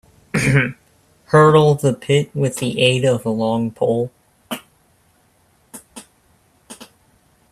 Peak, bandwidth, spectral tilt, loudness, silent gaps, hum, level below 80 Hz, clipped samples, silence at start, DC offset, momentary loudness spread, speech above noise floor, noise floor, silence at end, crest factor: 0 dBFS; 14.5 kHz; -5.5 dB/octave; -17 LUFS; none; none; -52 dBFS; under 0.1%; 0.35 s; under 0.1%; 21 LU; 42 dB; -58 dBFS; 0.7 s; 18 dB